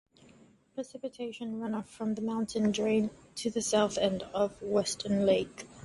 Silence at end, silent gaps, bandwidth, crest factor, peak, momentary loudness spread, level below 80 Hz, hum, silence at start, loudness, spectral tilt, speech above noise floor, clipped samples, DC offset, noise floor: 0 s; none; 11.5 kHz; 18 dB; -14 dBFS; 12 LU; -64 dBFS; none; 0.75 s; -31 LUFS; -4.5 dB/octave; 29 dB; under 0.1%; under 0.1%; -60 dBFS